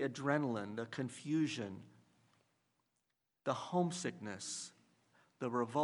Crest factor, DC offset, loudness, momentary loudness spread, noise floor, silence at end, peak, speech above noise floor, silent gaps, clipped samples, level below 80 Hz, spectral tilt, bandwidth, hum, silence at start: 22 dB; under 0.1%; -40 LUFS; 9 LU; -86 dBFS; 0 s; -18 dBFS; 47 dB; none; under 0.1%; -86 dBFS; -5 dB/octave; 11.5 kHz; none; 0 s